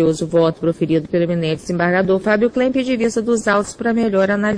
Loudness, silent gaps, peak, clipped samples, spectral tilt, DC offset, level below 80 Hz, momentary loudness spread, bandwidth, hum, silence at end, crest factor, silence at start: -17 LUFS; none; -2 dBFS; under 0.1%; -6 dB/octave; under 0.1%; -48 dBFS; 3 LU; 10.5 kHz; none; 0 s; 14 dB; 0 s